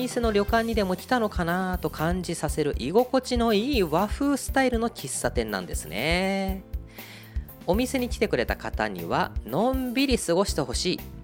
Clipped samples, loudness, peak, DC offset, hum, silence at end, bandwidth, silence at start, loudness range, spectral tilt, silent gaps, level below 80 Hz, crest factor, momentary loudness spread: under 0.1%; -26 LUFS; -8 dBFS; under 0.1%; none; 0 s; 17 kHz; 0 s; 3 LU; -4.5 dB/octave; none; -36 dBFS; 18 dB; 8 LU